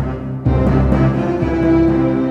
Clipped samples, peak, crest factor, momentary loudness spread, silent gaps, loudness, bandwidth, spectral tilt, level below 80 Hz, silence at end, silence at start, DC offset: under 0.1%; -2 dBFS; 12 dB; 5 LU; none; -15 LUFS; 6.6 kHz; -10 dB/octave; -24 dBFS; 0 s; 0 s; under 0.1%